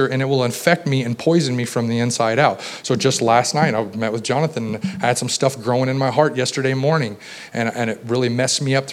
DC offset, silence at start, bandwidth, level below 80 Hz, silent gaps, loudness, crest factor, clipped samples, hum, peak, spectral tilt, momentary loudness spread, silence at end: under 0.1%; 0 s; 15.5 kHz; -64 dBFS; none; -19 LUFS; 18 dB; under 0.1%; none; 0 dBFS; -4.5 dB/octave; 7 LU; 0 s